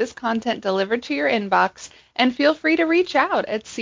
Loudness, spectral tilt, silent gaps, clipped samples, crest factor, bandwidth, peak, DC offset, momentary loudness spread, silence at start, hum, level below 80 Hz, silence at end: -20 LUFS; -4.5 dB/octave; none; under 0.1%; 16 dB; 7.6 kHz; -4 dBFS; under 0.1%; 6 LU; 0 s; none; -62 dBFS; 0 s